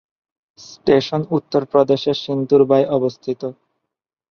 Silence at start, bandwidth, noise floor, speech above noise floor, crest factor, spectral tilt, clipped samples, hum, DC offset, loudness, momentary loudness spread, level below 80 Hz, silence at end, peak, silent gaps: 0.6 s; 6.8 kHz; -81 dBFS; 64 dB; 18 dB; -7 dB/octave; under 0.1%; none; under 0.1%; -18 LUFS; 12 LU; -60 dBFS; 0.8 s; -2 dBFS; none